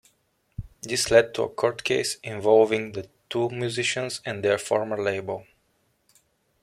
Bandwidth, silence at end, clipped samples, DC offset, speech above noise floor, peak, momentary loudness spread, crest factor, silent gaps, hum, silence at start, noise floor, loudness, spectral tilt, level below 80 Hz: 15 kHz; 1.2 s; under 0.1%; under 0.1%; 45 dB; -4 dBFS; 17 LU; 20 dB; none; none; 0.6 s; -69 dBFS; -24 LUFS; -3.5 dB/octave; -54 dBFS